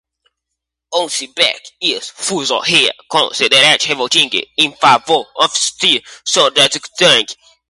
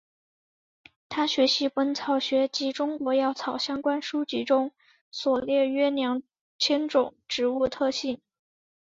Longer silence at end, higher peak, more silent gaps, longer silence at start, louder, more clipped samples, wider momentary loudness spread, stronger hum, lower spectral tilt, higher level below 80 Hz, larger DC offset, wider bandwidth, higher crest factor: second, 0.35 s vs 0.75 s; first, 0 dBFS vs -10 dBFS; second, none vs 5.01-5.12 s, 6.41-6.59 s; second, 0.9 s vs 1.1 s; first, -12 LUFS vs -26 LUFS; neither; about the same, 8 LU vs 8 LU; neither; second, -1 dB/octave vs -3 dB/octave; first, -62 dBFS vs -68 dBFS; neither; first, 16 kHz vs 7.8 kHz; about the same, 16 dB vs 18 dB